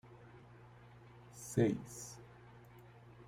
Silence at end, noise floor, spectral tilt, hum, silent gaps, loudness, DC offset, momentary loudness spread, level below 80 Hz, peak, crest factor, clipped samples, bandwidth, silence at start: 0 s; -59 dBFS; -6.5 dB/octave; 60 Hz at -55 dBFS; none; -39 LUFS; under 0.1%; 25 LU; -68 dBFS; -20 dBFS; 24 dB; under 0.1%; 16 kHz; 0.05 s